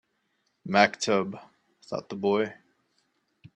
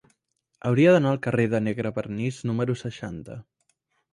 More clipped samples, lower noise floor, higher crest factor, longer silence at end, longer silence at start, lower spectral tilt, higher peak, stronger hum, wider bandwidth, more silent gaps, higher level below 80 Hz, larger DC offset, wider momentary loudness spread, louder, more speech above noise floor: neither; about the same, -75 dBFS vs -74 dBFS; first, 26 dB vs 18 dB; first, 1 s vs 0.7 s; about the same, 0.65 s vs 0.65 s; second, -4.5 dB/octave vs -7.5 dB/octave; about the same, -4 dBFS vs -6 dBFS; neither; about the same, 11 kHz vs 11 kHz; neither; second, -72 dBFS vs -58 dBFS; neither; about the same, 16 LU vs 18 LU; second, -27 LUFS vs -24 LUFS; about the same, 49 dB vs 51 dB